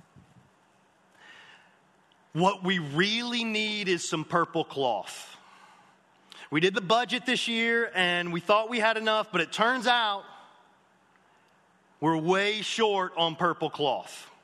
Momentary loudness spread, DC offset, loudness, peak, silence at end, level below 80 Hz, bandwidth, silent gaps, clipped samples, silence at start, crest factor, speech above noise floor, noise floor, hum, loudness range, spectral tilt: 7 LU; under 0.1%; -27 LUFS; -8 dBFS; 0.2 s; -78 dBFS; 12 kHz; none; under 0.1%; 1.3 s; 20 dB; 37 dB; -64 dBFS; none; 5 LU; -4 dB/octave